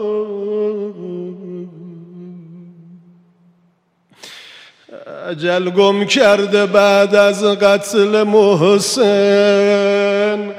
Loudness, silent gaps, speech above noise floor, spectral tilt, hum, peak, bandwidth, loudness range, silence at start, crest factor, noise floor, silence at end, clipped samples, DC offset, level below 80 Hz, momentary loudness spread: -13 LUFS; none; 47 dB; -4.5 dB/octave; none; 0 dBFS; 15 kHz; 18 LU; 0 s; 16 dB; -59 dBFS; 0 s; under 0.1%; under 0.1%; -64 dBFS; 22 LU